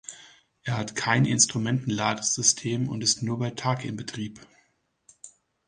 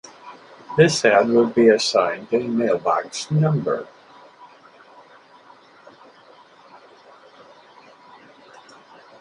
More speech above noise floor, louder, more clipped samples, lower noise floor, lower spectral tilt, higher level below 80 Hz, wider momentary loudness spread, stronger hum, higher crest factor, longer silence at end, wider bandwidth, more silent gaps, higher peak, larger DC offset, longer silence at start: first, 43 dB vs 31 dB; second, -25 LUFS vs -19 LUFS; neither; first, -69 dBFS vs -49 dBFS; second, -3 dB/octave vs -5.5 dB/octave; about the same, -62 dBFS vs -66 dBFS; second, 14 LU vs 17 LU; neither; about the same, 22 dB vs 20 dB; second, 0.4 s vs 5.35 s; about the same, 10.5 kHz vs 11.5 kHz; neither; second, -6 dBFS vs -2 dBFS; neither; second, 0.1 s vs 0.25 s